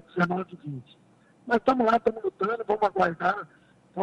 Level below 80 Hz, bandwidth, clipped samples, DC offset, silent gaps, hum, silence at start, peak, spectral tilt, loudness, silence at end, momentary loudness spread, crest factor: -62 dBFS; 10.5 kHz; under 0.1%; under 0.1%; none; none; 0.15 s; -10 dBFS; -7.5 dB/octave; -26 LUFS; 0 s; 18 LU; 18 dB